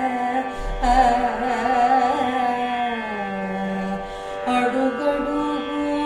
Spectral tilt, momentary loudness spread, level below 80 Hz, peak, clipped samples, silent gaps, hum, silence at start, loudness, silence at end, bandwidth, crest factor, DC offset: -5.5 dB/octave; 9 LU; -36 dBFS; -4 dBFS; under 0.1%; none; none; 0 s; -22 LUFS; 0 s; 12 kHz; 16 dB; under 0.1%